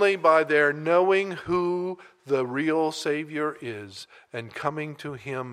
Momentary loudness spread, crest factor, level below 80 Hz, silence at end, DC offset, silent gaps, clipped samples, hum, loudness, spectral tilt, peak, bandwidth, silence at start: 18 LU; 18 dB; -66 dBFS; 0 s; under 0.1%; none; under 0.1%; none; -25 LUFS; -5.5 dB/octave; -6 dBFS; 13.5 kHz; 0 s